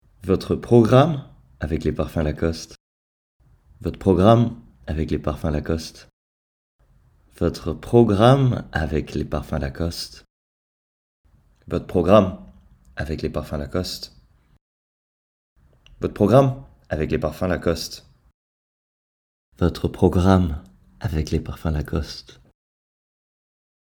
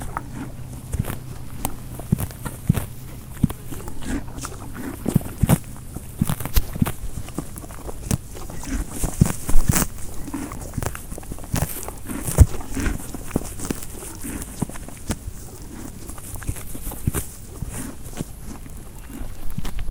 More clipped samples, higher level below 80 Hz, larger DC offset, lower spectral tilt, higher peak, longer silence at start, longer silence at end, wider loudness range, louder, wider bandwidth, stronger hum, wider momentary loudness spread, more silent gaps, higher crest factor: neither; second, -38 dBFS vs -30 dBFS; neither; first, -7.5 dB/octave vs -5.5 dB/octave; about the same, 0 dBFS vs 0 dBFS; first, 0.25 s vs 0 s; first, 1.6 s vs 0 s; about the same, 8 LU vs 7 LU; first, -21 LUFS vs -27 LUFS; about the same, 19 kHz vs 19 kHz; neither; about the same, 17 LU vs 15 LU; first, 2.80-3.40 s, 6.13-6.79 s, 10.30-11.24 s, 14.61-15.56 s, 18.34-19.52 s vs none; about the same, 22 dB vs 24 dB